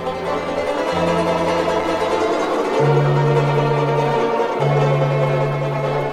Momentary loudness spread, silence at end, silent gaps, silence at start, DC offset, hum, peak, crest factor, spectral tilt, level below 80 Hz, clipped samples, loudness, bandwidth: 5 LU; 0 s; none; 0 s; under 0.1%; none; -4 dBFS; 14 dB; -7 dB/octave; -48 dBFS; under 0.1%; -18 LUFS; 10.5 kHz